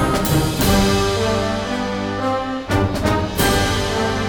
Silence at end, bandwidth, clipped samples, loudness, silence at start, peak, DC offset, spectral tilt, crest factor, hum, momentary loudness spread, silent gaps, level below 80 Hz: 0 s; 19.5 kHz; under 0.1%; -19 LUFS; 0 s; -2 dBFS; under 0.1%; -5 dB/octave; 16 dB; none; 6 LU; none; -30 dBFS